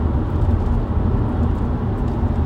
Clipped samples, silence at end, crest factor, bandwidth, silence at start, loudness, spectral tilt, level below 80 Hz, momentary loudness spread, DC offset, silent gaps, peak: under 0.1%; 0 s; 12 dB; 4.9 kHz; 0 s; -21 LUFS; -10.5 dB/octave; -22 dBFS; 2 LU; under 0.1%; none; -6 dBFS